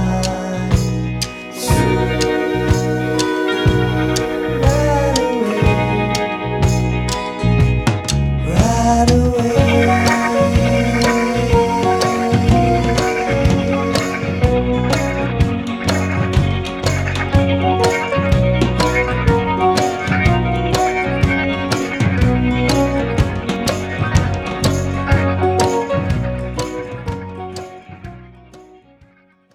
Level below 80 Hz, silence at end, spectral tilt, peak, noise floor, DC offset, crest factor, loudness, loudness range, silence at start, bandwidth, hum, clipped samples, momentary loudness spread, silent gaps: -26 dBFS; 0.9 s; -6 dB/octave; 0 dBFS; -52 dBFS; under 0.1%; 16 dB; -16 LUFS; 3 LU; 0 s; 16.5 kHz; none; under 0.1%; 6 LU; none